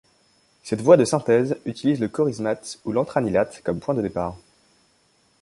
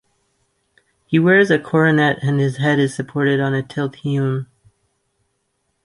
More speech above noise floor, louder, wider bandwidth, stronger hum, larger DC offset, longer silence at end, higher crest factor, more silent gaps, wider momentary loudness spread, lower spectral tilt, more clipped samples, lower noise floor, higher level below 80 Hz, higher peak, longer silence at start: second, 41 dB vs 53 dB; second, -22 LUFS vs -17 LUFS; about the same, 11.5 kHz vs 11.5 kHz; neither; neither; second, 1.05 s vs 1.4 s; about the same, 22 dB vs 18 dB; neither; first, 13 LU vs 10 LU; about the same, -6 dB/octave vs -7 dB/octave; neither; second, -62 dBFS vs -70 dBFS; first, -54 dBFS vs -60 dBFS; about the same, -2 dBFS vs -2 dBFS; second, 0.65 s vs 1.1 s